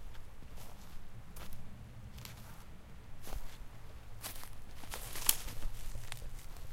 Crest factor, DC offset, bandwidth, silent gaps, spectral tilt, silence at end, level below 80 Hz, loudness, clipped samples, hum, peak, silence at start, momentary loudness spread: 32 dB; under 0.1%; 16.5 kHz; none; -2 dB/octave; 0 s; -46 dBFS; -42 LUFS; under 0.1%; none; -8 dBFS; 0 s; 21 LU